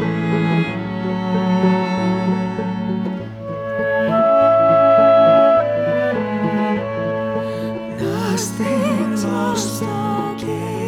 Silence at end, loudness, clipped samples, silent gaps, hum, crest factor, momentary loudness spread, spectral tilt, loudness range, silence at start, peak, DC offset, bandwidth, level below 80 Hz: 0 s; -17 LUFS; under 0.1%; none; none; 14 dB; 12 LU; -6 dB/octave; 6 LU; 0 s; -4 dBFS; under 0.1%; 16 kHz; -52 dBFS